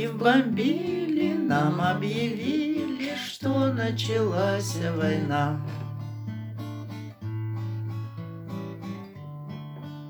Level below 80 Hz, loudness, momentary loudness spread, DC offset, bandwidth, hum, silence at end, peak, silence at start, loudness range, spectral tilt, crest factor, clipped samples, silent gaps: -70 dBFS; -27 LUFS; 14 LU; under 0.1%; over 20 kHz; none; 0 s; -6 dBFS; 0 s; 10 LU; -6.5 dB/octave; 20 dB; under 0.1%; none